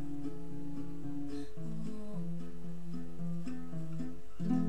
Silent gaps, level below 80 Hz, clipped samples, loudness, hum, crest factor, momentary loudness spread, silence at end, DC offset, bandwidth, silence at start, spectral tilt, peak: none; -56 dBFS; under 0.1%; -43 LUFS; none; 18 dB; 4 LU; 0 s; 2%; 13.5 kHz; 0 s; -8.5 dB/octave; -20 dBFS